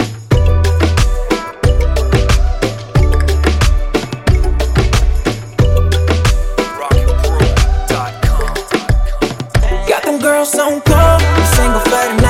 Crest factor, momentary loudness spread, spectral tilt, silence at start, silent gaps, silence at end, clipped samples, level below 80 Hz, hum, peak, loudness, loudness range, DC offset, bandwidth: 12 dB; 7 LU; -5.5 dB/octave; 0 s; none; 0 s; under 0.1%; -14 dBFS; none; 0 dBFS; -13 LUFS; 3 LU; under 0.1%; 16.5 kHz